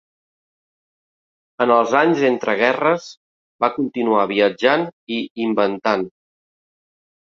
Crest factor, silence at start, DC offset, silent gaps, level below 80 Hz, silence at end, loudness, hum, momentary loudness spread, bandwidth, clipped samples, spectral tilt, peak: 20 dB; 1.6 s; under 0.1%; 3.17-3.59 s, 4.93-5.07 s, 5.30-5.35 s; -66 dBFS; 1.2 s; -18 LUFS; none; 8 LU; 7.4 kHz; under 0.1%; -5.5 dB/octave; 0 dBFS